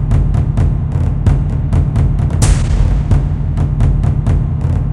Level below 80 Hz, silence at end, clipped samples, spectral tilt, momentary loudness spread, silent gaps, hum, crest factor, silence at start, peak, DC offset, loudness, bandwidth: -16 dBFS; 0 s; under 0.1%; -7.5 dB/octave; 3 LU; none; none; 12 dB; 0 s; 0 dBFS; under 0.1%; -14 LUFS; 11.5 kHz